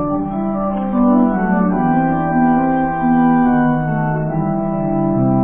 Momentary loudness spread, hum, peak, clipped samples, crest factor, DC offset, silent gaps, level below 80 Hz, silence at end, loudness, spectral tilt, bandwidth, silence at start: 6 LU; none; -4 dBFS; under 0.1%; 12 dB; under 0.1%; none; -36 dBFS; 0 s; -16 LUFS; -13 dB/octave; 3.3 kHz; 0 s